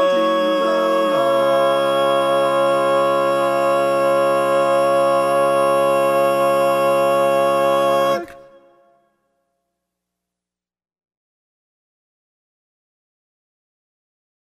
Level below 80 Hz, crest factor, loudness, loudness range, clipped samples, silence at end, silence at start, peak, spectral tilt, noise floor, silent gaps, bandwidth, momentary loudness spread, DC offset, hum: -68 dBFS; 14 dB; -17 LUFS; 5 LU; under 0.1%; 6.05 s; 0 s; -6 dBFS; -4.5 dB/octave; -88 dBFS; none; 14.5 kHz; 1 LU; under 0.1%; 60 Hz at -80 dBFS